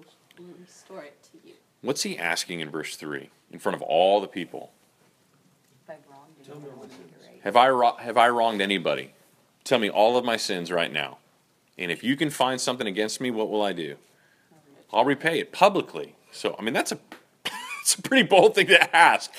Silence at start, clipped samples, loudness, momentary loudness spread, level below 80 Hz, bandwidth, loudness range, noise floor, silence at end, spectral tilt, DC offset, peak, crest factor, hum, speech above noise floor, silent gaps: 0.4 s; under 0.1%; -23 LUFS; 20 LU; -76 dBFS; 15.5 kHz; 8 LU; -64 dBFS; 0 s; -3 dB/octave; under 0.1%; -2 dBFS; 24 dB; none; 40 dB; none